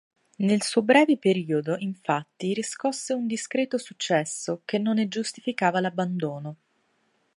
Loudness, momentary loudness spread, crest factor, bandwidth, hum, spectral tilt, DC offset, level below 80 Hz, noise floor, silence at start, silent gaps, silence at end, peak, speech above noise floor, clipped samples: -26 LUFS; 10 LU; 20 dB; 11.5 kHz; none; -5 dB/octave; under 0.1%; -76 dBFS; -70 dBFS; 0.4 s; none; 0.85 s; -6 dBFS; 44 dB; under 0.1%